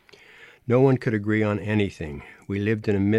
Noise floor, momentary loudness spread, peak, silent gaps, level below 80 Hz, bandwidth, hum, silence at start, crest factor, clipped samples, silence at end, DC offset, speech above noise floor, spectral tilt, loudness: -50 dBFS; 16 LU; -8 dBFS; none; -52 dBFS; 11.5 kHz; none; 0.4 s; 16 dB; under 0.1%; 0 s; under 0.1%; 28 dB; -8.5 dB/octave; -23 LUFS